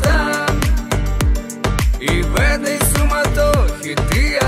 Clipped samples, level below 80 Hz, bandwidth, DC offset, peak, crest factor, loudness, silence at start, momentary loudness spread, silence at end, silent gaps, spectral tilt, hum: under 0.1%; -18 dBFS; 16 kHz; under 0.1%; -2 dBFS; 14 dB; -17 LUFS; 0 s; 4 LU; 0 s; none; -4.5 dB/octave; none